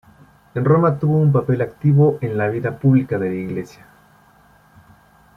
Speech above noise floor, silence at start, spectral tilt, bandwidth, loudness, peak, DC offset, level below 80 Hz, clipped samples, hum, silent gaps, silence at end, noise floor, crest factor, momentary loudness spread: 35 dB; 0.55 s; -10.5 dB/octave; 3.9 kHz; -18 LUFS; -2 dBFS; under 0.1%; -54 dBFS; under 0.1%; none; none; 1.7 s; -52 dBFS; 16 dB; 12 LU